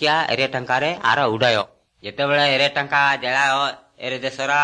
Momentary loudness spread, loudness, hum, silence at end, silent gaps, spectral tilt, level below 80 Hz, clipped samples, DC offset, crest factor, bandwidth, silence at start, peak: 11 LU; -19 LUFS; none; 0 s; none; -3.5 dB/octave; -62 dBFS; under 0.1%; under 0.1%; 16 dB; 9.8 kHz; 0 s; -4 dBFS